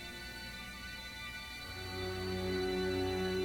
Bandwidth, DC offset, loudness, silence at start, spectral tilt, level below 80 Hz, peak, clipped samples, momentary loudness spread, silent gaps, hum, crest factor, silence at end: 18 kHz; under 0.1%; -39 LUFS; 0 s; -5 dB/octave; -54 dBFS; -24 dBFS; under 0.1%; 9 LU; none; 60 Hz at -55 dBFS; 14 dB; 0 s